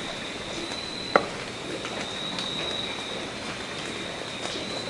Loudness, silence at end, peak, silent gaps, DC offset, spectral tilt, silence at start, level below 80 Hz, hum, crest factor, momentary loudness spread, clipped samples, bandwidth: -30 LUFS; 0 s; 0 dBFS; none; under 0.1%; -3 dB/octave; 0 s; -56 dBFS; none; 32 dB; 8 LU; under 0.1%; 11.5 kHz